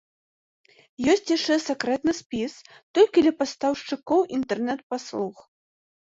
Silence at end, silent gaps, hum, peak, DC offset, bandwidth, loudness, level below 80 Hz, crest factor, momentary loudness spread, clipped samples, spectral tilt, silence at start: 0.7 s; 2.26-2.30 s, 2.83-2.94 s, 4.83-4.90 s; none; -6 dBFS; under 0.1%; 8 kHz; -24 LUFS; -62 dBFS; 18 dB; 11 LU; under 0.1%; -4 dB/octave; 1 s